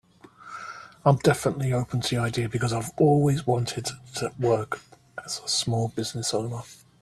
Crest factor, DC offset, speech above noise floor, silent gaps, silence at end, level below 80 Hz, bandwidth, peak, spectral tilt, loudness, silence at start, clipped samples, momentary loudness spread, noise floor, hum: 20 dB; under 0.1%; 24 dB; none; 0.25 s; -56 dBFS; 13.5 kHz; -6 dBFS; -5 dB/octave; -26 LUFS; 0.4 s; under 0.1%; 17 LU; -49 dBFS; none